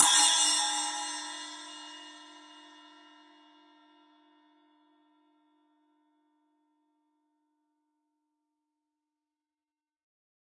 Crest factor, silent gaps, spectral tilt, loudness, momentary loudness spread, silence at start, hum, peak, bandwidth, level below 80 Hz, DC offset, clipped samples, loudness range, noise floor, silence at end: 30 dB; none; 3.5 dB/octave; -26 LUFS; 28 LU; 0 s; none; -6 dBFS; 11.5 kHz; under -90 dBFS; under 0.1%; under 0.1%; 28 LU; under -90 dBFS; 8 s